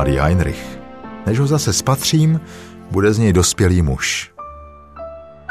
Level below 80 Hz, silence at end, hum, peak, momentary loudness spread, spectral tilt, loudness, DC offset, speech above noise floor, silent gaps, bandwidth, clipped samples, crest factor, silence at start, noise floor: -32 dBFS; 0.2 s; none; -2 dBFS; 20 LU; -5 dB/octave; -16 LUFS; 0.3%; 22 dB; none; 14 kHz; under 0.1%; 16 dB; 0 s; -37 dBFS